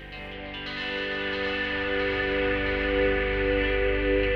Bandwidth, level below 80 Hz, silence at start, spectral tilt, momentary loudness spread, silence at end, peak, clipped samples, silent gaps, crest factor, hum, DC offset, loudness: 6.6 kHz; -36 dBFS; 0 s; -7 dB/octave; 9 LU; 0 s; -12 dBFS; under 0.1%; none; 14 dB; 50 Hz at -40 dBFS; under 0.1%; -26 LUFS